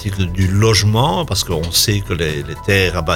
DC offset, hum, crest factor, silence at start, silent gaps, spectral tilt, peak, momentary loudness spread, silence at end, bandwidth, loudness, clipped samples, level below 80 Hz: under 0.1%; none; 16 dB; 0 s; none; -4 dB/octave; 0 dBFS; 7 LU; 0 s; 17 kHz; -15 LUFS; under 0.1%; -30 dBFS